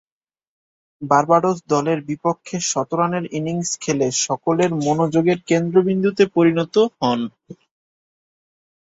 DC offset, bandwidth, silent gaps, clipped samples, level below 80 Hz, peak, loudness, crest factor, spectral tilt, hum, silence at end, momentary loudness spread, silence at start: under 0.1%; 8.4 kHz; none; under 0.1%; -62 dBFS; -2 dBFS; -19 LUFS; 18 dB; -5 dB/octave; none; 1.35 s; 7 LU; 1 s